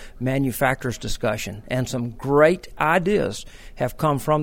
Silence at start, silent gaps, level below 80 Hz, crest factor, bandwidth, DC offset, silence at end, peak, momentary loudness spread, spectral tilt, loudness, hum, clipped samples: 0 s; none; -40 dBFS; 18 dB; 16.5 kHz; under 0.1%; 0 s; -4 dBFS; 11 LU; -5.5 dB/octave; -22 LUFS; none; under 0.1%